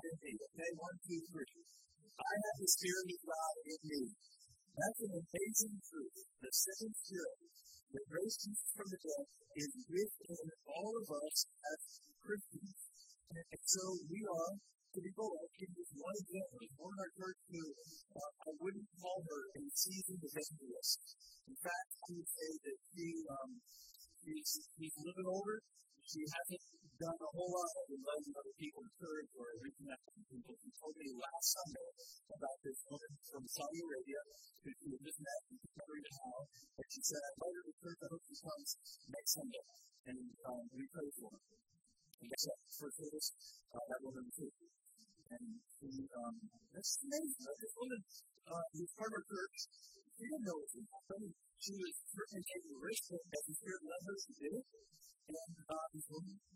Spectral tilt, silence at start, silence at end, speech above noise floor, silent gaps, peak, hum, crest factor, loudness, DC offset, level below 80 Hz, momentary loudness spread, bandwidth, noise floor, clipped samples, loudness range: -2.5 dB/octave; 0 s; 0 s; 23 dB; 7.83-7.87 s, 37.73-37.78 s, 40.00-40.04 s, 42.14-42.18 s; -18 dBFS; none; 28 dB; -46 LUFS; under 0.1%; -84 dBFS; 16 LU; 16 kHz; -70 dBFS; under 0.1%; 8 LU